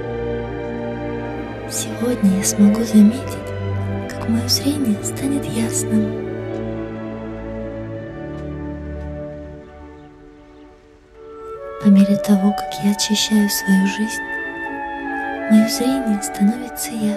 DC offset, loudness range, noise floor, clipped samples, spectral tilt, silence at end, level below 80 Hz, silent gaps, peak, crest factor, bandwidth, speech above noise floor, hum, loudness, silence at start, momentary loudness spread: under 0.1%; 14 LU; -46 dBFS; under 0.1%; -5 dB/octave; 0 s; -42 dBFS; none; -2 dBFS; 18 dB; 14.5 kHz; 30 dB; none; -19 LUFS; 0 s; 15 LU